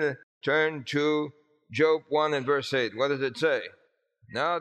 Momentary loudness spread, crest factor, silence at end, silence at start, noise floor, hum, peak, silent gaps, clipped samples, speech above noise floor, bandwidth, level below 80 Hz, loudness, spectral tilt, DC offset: 10 LU; 18 dB; 0 s; 0 s; -65 dBFS; none; -10 dBFS; 0.23-0.41 s; under 0.1%; 38 dB; 11 kHz; -78 dBFS; -27 LUFS; -5 dB/octave; under 0.1%